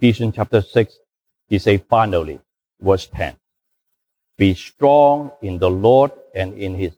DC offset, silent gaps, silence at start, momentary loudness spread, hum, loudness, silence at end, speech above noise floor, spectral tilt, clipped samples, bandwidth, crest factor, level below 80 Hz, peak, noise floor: under 0.1%; none; 0 s; 13 LU; none; -17 LUFS; 0.05 s; 58 dB; -7.5 dB/octave; under 0.1%; 15 kHz; 16 dB; -44 dBFS; -2 dBFS; -75 dBFS